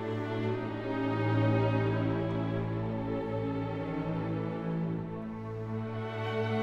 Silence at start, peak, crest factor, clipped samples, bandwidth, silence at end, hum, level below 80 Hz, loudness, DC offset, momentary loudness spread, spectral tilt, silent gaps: 0 s; -16 dBFS; 14 dB; under 0.1%; 6.2 kHz; 0 s; none; -54 dBFS; -33 LUFS; under 0.1%; 8 LU; -9 dB/octave; none